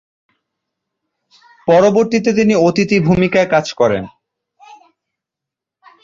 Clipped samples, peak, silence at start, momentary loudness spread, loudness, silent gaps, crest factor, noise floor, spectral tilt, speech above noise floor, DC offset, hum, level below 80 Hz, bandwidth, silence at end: under 0.1%; -2 dBFS; 1.65 s; 7 LU; -13 LUFS; none; 14 dB; -84 dBFS; -6 dB/octave; 71 dB; under 0.1%; none; -48 dBFS; 7.6 kHz; 1.95 s